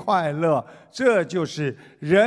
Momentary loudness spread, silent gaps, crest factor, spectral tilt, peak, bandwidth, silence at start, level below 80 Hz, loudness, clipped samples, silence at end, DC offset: 10 LU; none; 16 dB; -6 dB/octave; -6 dBFS; 11 kHz; 0 s; -64 dBFS; -23 LUFS; under 0.1%; 0 s; under 0.1%